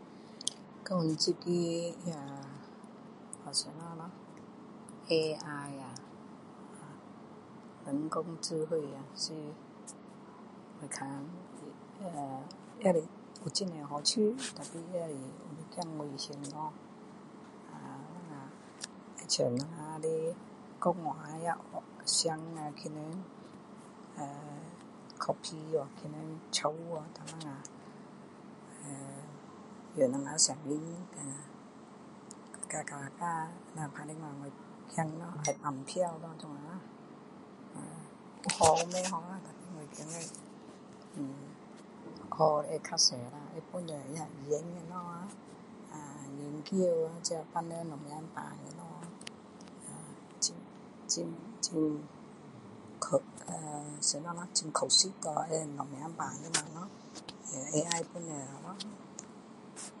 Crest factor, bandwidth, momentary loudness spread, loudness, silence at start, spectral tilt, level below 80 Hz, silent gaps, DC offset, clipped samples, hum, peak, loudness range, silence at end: 30 dB; 11.5 kHz; 21 LU; -36 LUFS; 0 s; -3.5 dB/octave; -76 dBFS; none; under 0.1%; under 0.1%; none; -8 dBFS; 9 LU; 0 s